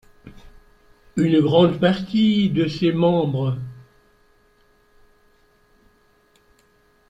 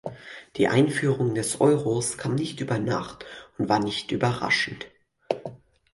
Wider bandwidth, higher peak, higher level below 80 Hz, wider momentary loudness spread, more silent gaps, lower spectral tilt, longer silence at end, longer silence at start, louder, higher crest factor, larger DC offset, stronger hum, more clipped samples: second, 9.2 kHz vs 11.5 kHz; about the same, -4 dBFS vs -6 dBFS; about the same, -54 dBFS vs -58 dBFS; second, 11 LU vs 18 LU; neither; first, -8 dB/octave vs -5 dB/octave; first, 3.3 s vs 0.35 s; first, 0.25 s vs 0.05 s; first, -19 LUFS vs -25 LUFS; about the same, 20 dB vs 20 dB; neither; neither; neither